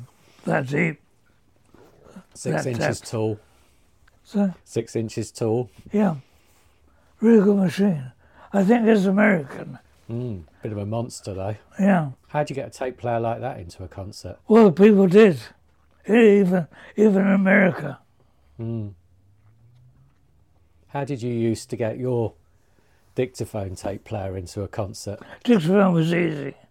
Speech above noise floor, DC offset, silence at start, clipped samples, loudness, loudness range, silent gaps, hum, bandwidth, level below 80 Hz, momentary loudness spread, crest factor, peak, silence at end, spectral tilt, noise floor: 42 dB; under 0.1%; 0 s; under 0.1%; -21 LUFS; 12 LU; none; none; 13 kHz; -58 dBFS; 19 LU; 20 dB; -4 dBFS; 0.2 s; -7 dB/octave; -62 dBFS